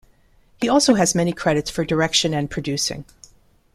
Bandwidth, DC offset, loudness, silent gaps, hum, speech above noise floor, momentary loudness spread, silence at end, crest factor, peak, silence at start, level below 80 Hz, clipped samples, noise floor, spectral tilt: 15 kHz; under 0.1%; -20 LUFS; none; none; 36 dB; 9 LU; 0.7 s; 18 dB; -2 dBFS; 0.6 s; -48 dBFS; under 0.1%; -55 dBFS; -4 dB/octave